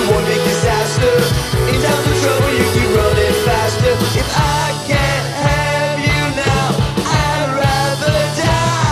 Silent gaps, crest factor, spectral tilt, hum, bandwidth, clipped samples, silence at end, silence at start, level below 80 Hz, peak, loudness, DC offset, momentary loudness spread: none; 14 dB; -4.5 dB/octave; none; 14 kHz; under 0.1%; 0 s; 0 s; -28 dBFS; -2 dBFS; -15 LUFS; under 0.1%; 3 LU